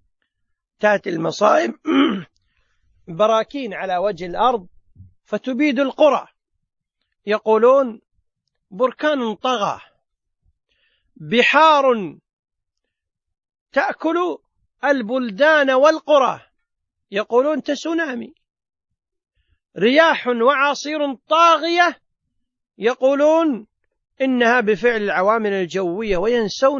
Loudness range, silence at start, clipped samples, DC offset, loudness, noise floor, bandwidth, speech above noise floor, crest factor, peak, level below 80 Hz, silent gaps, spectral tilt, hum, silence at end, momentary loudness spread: 5 LU; 0.8 s; under 0.1%; under 0.1%; -18 LUFS; -80 dBFS; 7.4 kHz; 62 dB; 18 dB; 0 dBFS; -54 dBFS; 12.33-12.43 s, 13.61-13.66 s; -4.5 dB/octave; none; 0 s; 12 LU